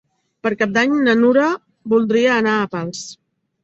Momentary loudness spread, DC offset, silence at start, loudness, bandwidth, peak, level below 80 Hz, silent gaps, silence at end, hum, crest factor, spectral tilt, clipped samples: 13 LU; under 0.1%; 0.45 s; -17 LUFS; 8 kHz; -2 dBFS; -62 dBFS; none; 0.5 s; none; 16 dB; -5 dB/octave; under 0.1%